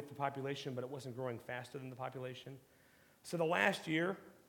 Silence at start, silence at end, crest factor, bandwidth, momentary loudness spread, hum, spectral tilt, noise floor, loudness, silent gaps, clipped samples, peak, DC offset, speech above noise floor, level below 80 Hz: 0 s; 0.15 s; 26 dB; 18 kHz; 16 LU; none; -5 dB/octave; -66 dBFS; -40 LUFS; none; under 0.1%; -16 dBFS; under 0.1%; 26 dB; -84 dBFS